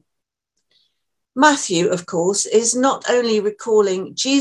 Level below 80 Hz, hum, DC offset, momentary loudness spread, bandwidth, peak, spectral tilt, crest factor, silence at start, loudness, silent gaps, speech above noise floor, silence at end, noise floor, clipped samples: -68 dBFS; none; under 0.1%; 6 LU; 12 kHz; 0 dBFS; -3 dB/octave; 18 dB; 1.35 s; -17 LUFS; none; 63 dB; 0 s; -81 dBFS; under 0.1%